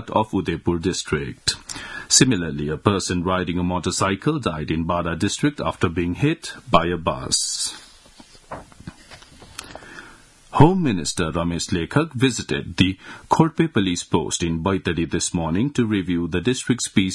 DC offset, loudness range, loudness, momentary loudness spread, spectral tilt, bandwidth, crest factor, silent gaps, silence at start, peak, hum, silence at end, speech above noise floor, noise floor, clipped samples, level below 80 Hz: under 0.1%; 4 LU; -21 LUFS; 18 LU; -4.5 dB/octave; 12 kHz; 22 dB; none; 0 s; 0 dBFS; none; 0 s; 27 dB; -48 dBFS; under 0.1%; -46 dBFS